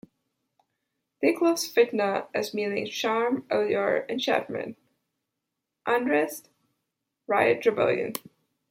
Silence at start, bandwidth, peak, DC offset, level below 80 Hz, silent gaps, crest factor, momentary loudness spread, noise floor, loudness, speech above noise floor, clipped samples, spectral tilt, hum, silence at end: 1.2 s; 16.5 kHz; -8 dBFS; under 0.1%; -76 dBFS; none; 20 dB; 11 LU; -84 dBFS; -26 LUFS; 58 dB; under 0.1%; -4 dB/octave; none; 0.5 s